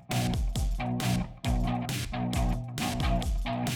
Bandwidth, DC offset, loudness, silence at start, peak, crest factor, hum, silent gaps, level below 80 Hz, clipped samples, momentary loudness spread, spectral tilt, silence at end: 20 kHz; under 0.1%; -31 LUFS; 0 s; -16 dBFS; 14 dB; none; none; -34 dBFS; under 0.1%; 3 LU; -5.5 dB/octave; 0 s